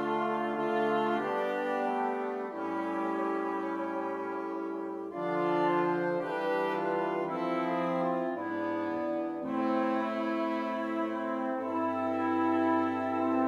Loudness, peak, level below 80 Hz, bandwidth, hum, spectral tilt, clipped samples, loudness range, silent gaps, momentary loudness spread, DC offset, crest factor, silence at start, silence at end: -32 LUFS; -18 dBFS; -82 dBFS; 7.4 kHz; none; -7 dB/octave; under 0.1%; 2 LU; none; 6 LU; under 0.1%; 14 dB; 0 s; 0 s